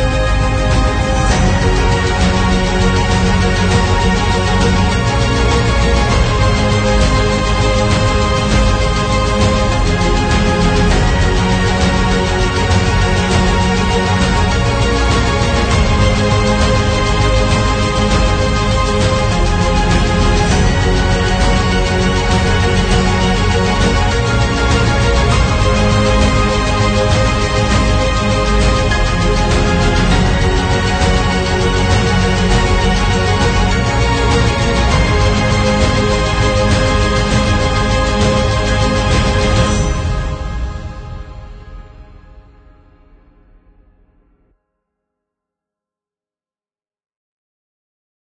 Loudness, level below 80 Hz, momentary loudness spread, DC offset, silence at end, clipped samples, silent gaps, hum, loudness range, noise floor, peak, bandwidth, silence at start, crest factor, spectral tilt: -13 LUFS; -18 dBFS; 2 LU; under 0.1%; 6.1 s; under 0.1%; none; none; 1 LU; under -90 dBFS; 0 dBFS; 9.4 kHz; 0 s; 12 dB; -5 dB/octave